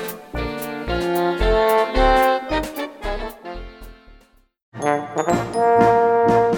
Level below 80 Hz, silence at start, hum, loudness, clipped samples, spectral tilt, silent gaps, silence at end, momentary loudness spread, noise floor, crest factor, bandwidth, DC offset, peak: -32 dBFS; 0 s; none; -19 LUFS; under 0.1%; -5.5 dB/octave; 4.62-4.72 s; 0 s; 14 LU; -52 dBFS; 18 dB; over 20 kHz; under 0.1%; -2 dBFS